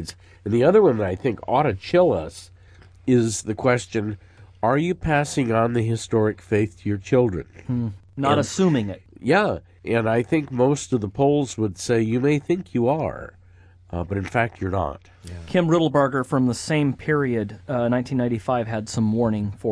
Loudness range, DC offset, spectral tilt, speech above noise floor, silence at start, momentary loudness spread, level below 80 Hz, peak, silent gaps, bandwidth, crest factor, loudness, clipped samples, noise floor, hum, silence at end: 2 LU; under 0.1%; -6.5 dB/octave; 29 dB; 0 s; 11 LU; -48 dBFS; -6 dBFS; none; 11 kHz; 16 dB; -22 LUFS; under 0.1%; -50 dBFS; none; 0 s